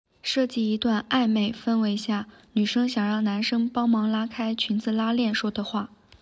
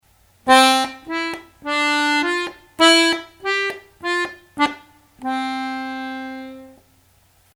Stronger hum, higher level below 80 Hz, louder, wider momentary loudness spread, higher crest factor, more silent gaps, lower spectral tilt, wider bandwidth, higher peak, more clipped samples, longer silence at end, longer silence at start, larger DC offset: neither; about the same, -62 dBFS vs -60 dBFS; second, -25 LUFS vs -19 LUFS; second, 7 LU vs 18 LU; second, 14 dB vs 20 dB; neither; first, -5.5 dB/octave vs -1 dB/octave; second, 8 kHz vs 18 kHz; second, -12 dBFS vs 0 dBFS; neither; second, 0.35 s vs 0.85 s; second, 0.25 s vs 0.45 s; neither